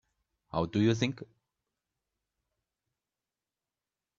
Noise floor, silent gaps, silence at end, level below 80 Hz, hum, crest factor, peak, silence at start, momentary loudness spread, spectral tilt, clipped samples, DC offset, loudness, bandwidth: under -90 dBFS; none; 2.95 s; -66 dBFS; none; 24 dB; -14 dBFS; 0.55 s; 11 LU; -6.5 dB/octave; under 0.1%; under 0.1%; -31 LUFS; 7.6 kHz